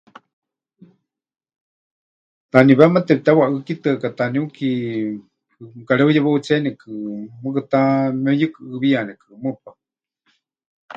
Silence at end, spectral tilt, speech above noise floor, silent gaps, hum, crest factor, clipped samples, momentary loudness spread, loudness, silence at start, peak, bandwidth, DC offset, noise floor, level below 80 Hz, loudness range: 0.05 s; -8 dB/octave; 51 dB; 10.66-10.88 s; none; 20 dB; under 0.1%; 16 LU; -18 LUFS; 2.55 s; 0 dBFS; 7.6 kHz; under 0.1%; -69 dBFS; -64 dBFS; 4 LU